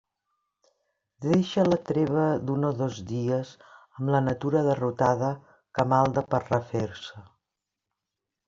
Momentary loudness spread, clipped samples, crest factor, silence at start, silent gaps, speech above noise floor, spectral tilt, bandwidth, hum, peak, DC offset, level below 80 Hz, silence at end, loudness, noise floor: 11 LU; under 0.1%; 20 dB; 1.2 s; none; 61 dB; -7.5 dB/octave; 7.6 kHz; none; -8 dBFS; under 0.1%; -62 dBFS; 1.25 s; -26 LUFS; -86 dBFS